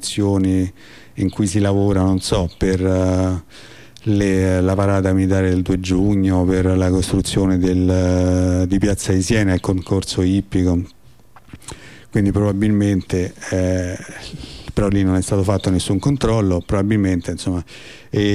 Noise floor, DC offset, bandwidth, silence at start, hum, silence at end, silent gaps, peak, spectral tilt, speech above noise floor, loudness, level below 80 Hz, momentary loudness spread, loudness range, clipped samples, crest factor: -48 dBFS; 0.5%; 13 kHz; 0 s; none; 0 s; none; -6 dBFS; -6.5 dB/octave; 31 dB; -18 LUFS; -36 dBFS; 10 LU; 4 LU; under 0.1%; 12 dB